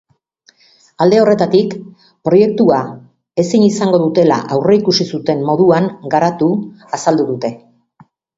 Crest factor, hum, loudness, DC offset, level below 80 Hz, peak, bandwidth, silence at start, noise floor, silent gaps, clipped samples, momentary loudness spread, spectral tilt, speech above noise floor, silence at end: 14 dB; none; -14 LUFS; under 0.1%; -56 dBFS; 0 dBFS; 8 kHz; 1 s; -53 dBFS; none; under 0.1%; 11 LU; -6 dB/octave; 41 dB; 0.8 s